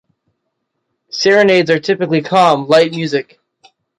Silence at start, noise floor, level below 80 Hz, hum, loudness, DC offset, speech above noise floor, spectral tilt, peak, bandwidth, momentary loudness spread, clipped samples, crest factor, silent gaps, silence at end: 1.15 s; -72 dBFS; -62 dBFS; none; -13 LUFS; under 0.1%; 59 dB; -5 dB/octave; 0 dBFS; 11.5 kHz; 9 LU; under 0.1%; 14 dB; none; 0.75 s